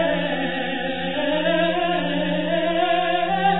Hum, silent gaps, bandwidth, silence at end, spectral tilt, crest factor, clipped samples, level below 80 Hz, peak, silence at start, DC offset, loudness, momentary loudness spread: none; none; 4.1 kHz; 0 s; -9 dB/octave; 14 dB; under 0.1%; -52 dBFS; -8 dBFS; 0 s; 2%; -22 LUFS; 5 LU